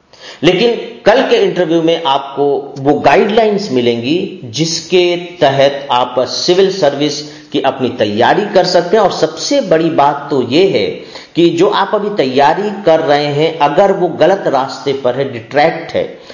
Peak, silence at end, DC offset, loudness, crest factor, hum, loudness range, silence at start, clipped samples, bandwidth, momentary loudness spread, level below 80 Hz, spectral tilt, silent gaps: 0 dBFS; 0 s; under 0.1%; -12 LUFS; 12 dB; none; 1 LU; 0.2 s; under 0.1%; 7.4 kHz; 6 LU; -52 dBFS; -5 dB/octave; none